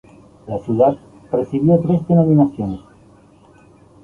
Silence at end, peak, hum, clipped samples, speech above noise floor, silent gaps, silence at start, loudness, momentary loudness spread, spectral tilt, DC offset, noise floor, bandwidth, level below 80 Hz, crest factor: 1.25 s; -2 dBFS; none; under 0.1%; 33 dB; none; 0.45 s; -17 LUFS; 14 LU; -11.5 dB/octave; under 0.1%; -48 dBFS; 3.6 kHz; -48 dBFS; 16 dB